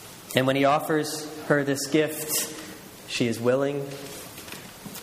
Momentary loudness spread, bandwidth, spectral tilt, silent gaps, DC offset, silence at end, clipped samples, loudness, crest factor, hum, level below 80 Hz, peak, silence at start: 17 LU; 15.5 kHz; -4 dB/octave; none; under 0.1%; 0 s; under 0.1%; -25 LUFS; 24 dB; none; -64 dBFS; -2 dBFS; 0 s